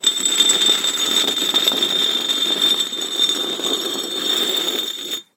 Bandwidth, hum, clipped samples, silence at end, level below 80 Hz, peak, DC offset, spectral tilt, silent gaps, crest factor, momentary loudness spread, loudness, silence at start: 16.5 kHz; none; under 0.1%; 0.15 s; -74 dBFS; -2 dBFS; under 0.1%; 0.5 dB/octave; none; 18 dB; 7 LU; -16 LUFS; 0 s